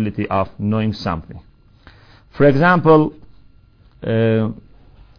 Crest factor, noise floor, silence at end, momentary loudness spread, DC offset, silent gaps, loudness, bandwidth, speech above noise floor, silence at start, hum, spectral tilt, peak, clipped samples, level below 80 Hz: 18 dB; -49 dBFS; 0.65 s; 13 LU; under 0.1%; none; -17 LUFS; 5.4 kHz; 33 dB; 0 s; none; -9 dB/octave; 0 dBFS; under 0.1%; -44 dBFS